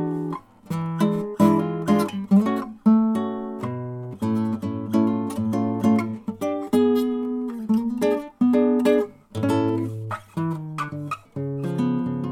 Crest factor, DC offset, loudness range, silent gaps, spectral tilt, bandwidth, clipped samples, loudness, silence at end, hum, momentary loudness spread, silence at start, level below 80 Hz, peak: 20 dB; under 0.1%; 3 LU; none; -8 dB/octave; 14.5 kHz; under 0.1%; -23 LUFS; 0 s; none; 11 LU; 0 s; -62 dBFS; -4 dBFS